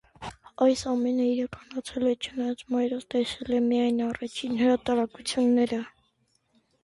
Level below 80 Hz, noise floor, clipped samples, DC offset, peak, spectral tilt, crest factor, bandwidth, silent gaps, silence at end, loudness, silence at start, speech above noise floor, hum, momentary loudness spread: -60 dBFS; -71 dBFS; under 0.1%; under 0.1%; -12 dBFS; -4.5 dB/octave; 16 dB; 11.5 kHz; none; 0.95 s; -27 LUFS; 0.2 s; 45 dB; none; 11 LU